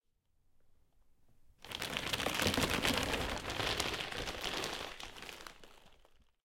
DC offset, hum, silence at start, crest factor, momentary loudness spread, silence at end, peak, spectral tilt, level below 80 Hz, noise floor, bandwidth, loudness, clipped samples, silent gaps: under 0.1%; none; 0.65 s; 30 dB; 15 LU; 0.5 s; -10 dBFS; -3 dB/octave; -54 dBFS; -73 dBFS; 17 kHz; -36 LUFS; under 0.1%; none